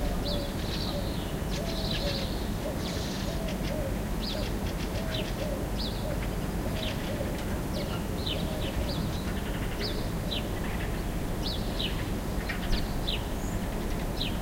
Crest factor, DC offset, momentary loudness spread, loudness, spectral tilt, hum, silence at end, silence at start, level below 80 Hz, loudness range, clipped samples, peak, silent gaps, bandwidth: 18 dB; under 0.1%; 2 LU; -32 LUFS; -5 dB/octave; none; 0 s; 0 s; -36 dBFS; 0 LU; under 0.1%; -14 dBFS; none; 16 kHz